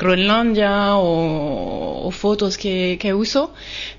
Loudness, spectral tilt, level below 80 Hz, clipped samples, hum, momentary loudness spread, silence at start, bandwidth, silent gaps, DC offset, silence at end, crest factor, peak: -19 LUFS; -5.5 dB/octave; -40 dBFS; under 0.1%; none; 10 LU; 0 s; 7.4 kHz; none; under 0.1%; 0 s; 14 dB; -4 dBFS